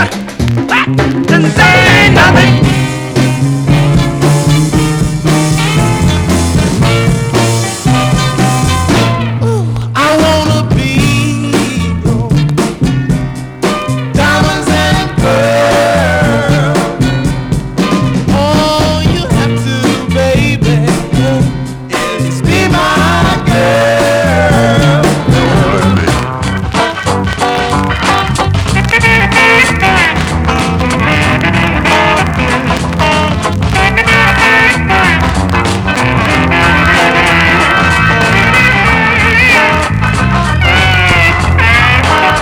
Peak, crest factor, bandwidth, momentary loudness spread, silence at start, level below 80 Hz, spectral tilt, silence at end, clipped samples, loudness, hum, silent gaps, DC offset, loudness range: 0 dBFS; 10 dB; over 20 kHz; 7 LU; 0 s; -22 dBFS; -5 dB/octave; 0 s; 0.4%; -9 LUFS; none; none; under 0.1%; 4 LU